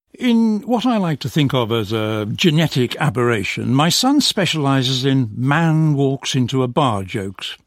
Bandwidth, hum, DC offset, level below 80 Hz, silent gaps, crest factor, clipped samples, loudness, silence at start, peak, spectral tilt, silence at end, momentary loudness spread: 16 kHz; none; under 0.1%; -54 dBFS; none; 16 dB; under 0.1%; -17 LUFS; 0.2 s; -2 dBFS; -5 dB/octave; 0.1 s; 5 LU